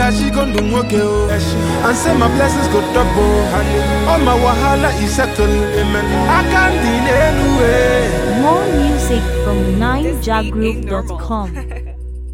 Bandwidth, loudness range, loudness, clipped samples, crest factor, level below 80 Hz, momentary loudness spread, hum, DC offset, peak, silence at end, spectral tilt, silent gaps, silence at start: 16.5 kHz; 3 LU; -14 LUFS; under 0.1%; 14 dB; -20 dBFS; 9 LU; none; under 0.1%; 0 dBFS; 0 s; -5.5 dB/octave; none; 0 s